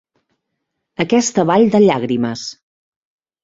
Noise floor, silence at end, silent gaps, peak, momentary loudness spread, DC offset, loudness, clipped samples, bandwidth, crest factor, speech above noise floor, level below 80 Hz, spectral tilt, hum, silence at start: -75 dBFS; 0.9 s; none; -2 dBFS; 16 LU; under 0.1%; -15 LUFS; under 0.1%; 7.8 kHz; 16 dB; 61 dB; -56 dBFS; -5 dB/octave; none; 1 s